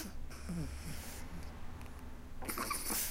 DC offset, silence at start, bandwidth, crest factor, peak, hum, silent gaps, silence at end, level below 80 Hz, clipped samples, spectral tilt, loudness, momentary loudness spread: under 0.1%; 0 s; 16 kHz; 18 dB; -24 dBFS; none; none; 0 s; -48 dBFS; under 0.1%; -3 dB/octave; -43 LUFS; 14 LU